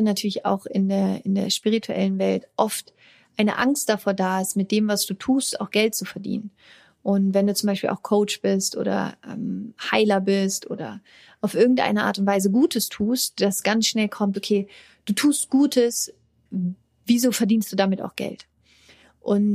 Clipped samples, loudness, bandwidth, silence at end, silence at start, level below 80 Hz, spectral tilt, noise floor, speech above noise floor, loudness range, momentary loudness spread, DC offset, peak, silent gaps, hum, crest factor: under 0.1%; -23 LUFS; 15.5 kHz; 0 s; 0 s; -66 dBFS; -4.5 dB/octave; -55 dBFS; 33 dB; 2 LU; 12 LU; under 0.1%; -4 dBFS; none; none; 20 dB